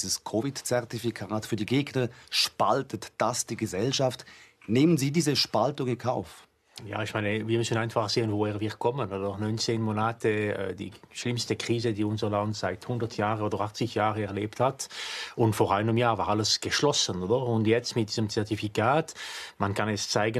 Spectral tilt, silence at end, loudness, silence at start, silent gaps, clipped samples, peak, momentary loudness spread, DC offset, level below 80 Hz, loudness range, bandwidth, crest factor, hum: -4.5 dB/octave; 0 s; -28 LUFS; 0 s; none; under 0.1%; -10 dBFS; 9 LU; under 0.1%; -66 dBFS; 4 LU; 13 kHz; 18 dB; none